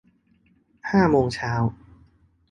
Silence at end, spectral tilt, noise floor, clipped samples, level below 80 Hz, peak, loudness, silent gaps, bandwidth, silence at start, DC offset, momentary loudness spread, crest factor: 0.8 s; -7.5 dB/octave; -62 dBFS; under 0.1%; -48 dBFS; -6 dBFS; -22 LUFS; none; 11 kHz; 0.85 s; under 0.1%; 9 LU; 20 dB